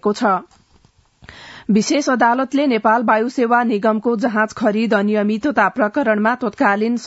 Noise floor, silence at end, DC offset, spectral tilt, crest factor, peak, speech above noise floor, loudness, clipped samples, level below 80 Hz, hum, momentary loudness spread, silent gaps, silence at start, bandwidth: -54 dBFS; 0 s; under 0.1%; -5.5 dB/octave; 16 dB; -2 dBFS; 38 dB; -17 LUFS; under 0.1%; -60 dBFS; none; 3 LU; none; 0.05 s; 8 kHz